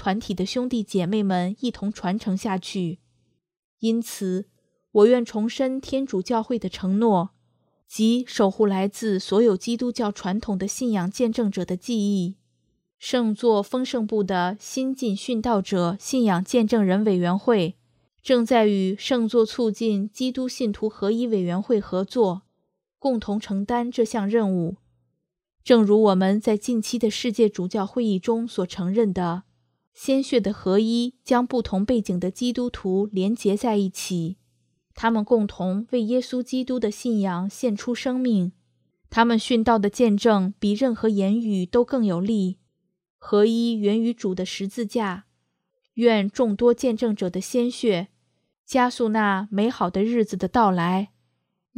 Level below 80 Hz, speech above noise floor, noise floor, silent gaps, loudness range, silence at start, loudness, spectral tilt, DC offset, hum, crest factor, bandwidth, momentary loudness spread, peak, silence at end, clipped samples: -56 dBFS; 54 dB; -76 dBFS; 3.59-3.78 s, 29.87-29.92 s, 43.10-43.19 s, 48.58-48.64 s; 4 LU; 0 s; -23 LUFS; -6 dB/octave; under 0.1%; none; 20 dB; 15 kHz; 8 LU; -2 dBFS; 0.7 s; under 0.1%